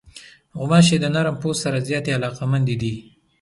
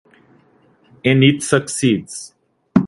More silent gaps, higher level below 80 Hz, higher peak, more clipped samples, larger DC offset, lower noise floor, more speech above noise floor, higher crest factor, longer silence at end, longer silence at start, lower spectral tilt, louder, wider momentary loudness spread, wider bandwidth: neither; about the same, -52 dBFS vs -54 dBFS; second, -4 dBFS vs 0 dBFS; neither; neither; second, -45 dBFS vs -54 dBFS; second, 26 dB vs 39 dB; about the same, 18 dB vs 18 dB; first, 0.4 s vs 0 s; second, 0.05 s vs 1.05 s; about the same, -5.5 dB/octave vs -5 dB/octave; second, -20 LUFS vs -16 LUFS; second, 14 LU vs 18 LU; about the same, 11.5 kHz vs 11.5 kHz